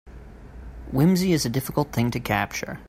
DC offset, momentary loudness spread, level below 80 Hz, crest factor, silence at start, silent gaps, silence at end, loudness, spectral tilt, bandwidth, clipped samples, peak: under 0.1%; 21 LU; -44 dBFS; 16 dB; 0.05 s; none; 0 s; -23 LUFS; -5.5 dB/octave; 16 kHz; under 0.1%; -8 dBFS